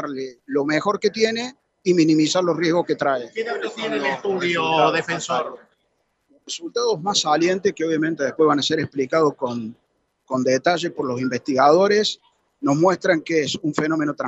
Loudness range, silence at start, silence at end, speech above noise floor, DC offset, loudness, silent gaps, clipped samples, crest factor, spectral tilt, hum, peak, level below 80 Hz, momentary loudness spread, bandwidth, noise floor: 3 LU; 0 s; 0 s; 49 dB; under 0.1%; -21 LUFS; none; under 0.1%; 18 dB; -4.5 dB/octave; none; -4 dBFS; -68 dBFS; 10 LU; 8.4 kHz; -69 dBFS